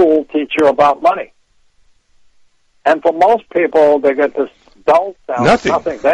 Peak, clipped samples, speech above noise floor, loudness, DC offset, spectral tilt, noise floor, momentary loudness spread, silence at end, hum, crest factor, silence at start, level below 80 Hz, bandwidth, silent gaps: -2 dBFS; under 0.1%; 40 dB; -14 LUFS; under 0.1%; -5.5 dB/octave; -52 dBFS; 10 LU; 0 s; none; 12 dB; 0 s; -48 dBFS; 11 kHz; none